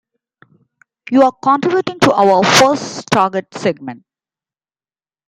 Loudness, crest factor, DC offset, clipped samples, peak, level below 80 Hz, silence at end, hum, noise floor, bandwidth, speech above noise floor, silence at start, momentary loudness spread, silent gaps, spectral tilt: -13 LUFS; 16 dB; under 0.1%; under 0.1%; 0 dBFS; -56 dBFS; 1.35 s; none; under -90 dBFS; 16.5 kHz; over 77 dB; 1.1 s; 11 LU; none; -4 dB/octave